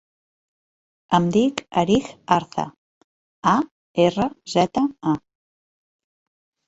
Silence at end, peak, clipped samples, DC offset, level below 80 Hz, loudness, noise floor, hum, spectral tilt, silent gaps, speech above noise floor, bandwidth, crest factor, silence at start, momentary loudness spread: 1.5 s; -2 dBFS; under 0.1%; under 0.1%; -54 dBFS; -22 LUFS; under -90 dBFS; none; -6 dB/octave; 2.78-3.43 s, 3.71-3.94 s; over 70 dB; 8 kHz; 20 dB; 1.1 s; 8 LU